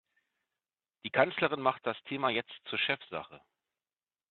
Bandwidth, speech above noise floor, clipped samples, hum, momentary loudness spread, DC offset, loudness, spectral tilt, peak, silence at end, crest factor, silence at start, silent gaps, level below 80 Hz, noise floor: 4.5 kHz; over 57 dB; under 0.1%; none; 13 LU; under 0.1%; -32 LUFS; -1.5 dB/octave; -10 dBFS; 0.95 s; 26 dB; 1.05 s; none; -76 dBFS; under -90 dBFS